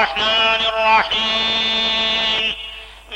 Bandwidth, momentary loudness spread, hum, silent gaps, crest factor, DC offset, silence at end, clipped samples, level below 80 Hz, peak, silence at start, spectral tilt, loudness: 16.5 kHz; 9 LU; none; none; 14 dB; under 0.1%; 0 s; under 0.1%; -44 dBFS; -4 dBFS; 0 s; -2 dB/octave; -15 LUFS